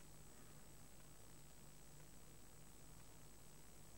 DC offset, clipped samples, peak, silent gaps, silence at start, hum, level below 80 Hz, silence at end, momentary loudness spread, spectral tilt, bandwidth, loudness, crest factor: under 0.1%; under 0.1%; -46 dBFS; none; 0 s; none; -70 dBFS; 0 s; 1 LU; -3.5 dB/octave; 16.5 kHz; -63 LUFS; 14 dB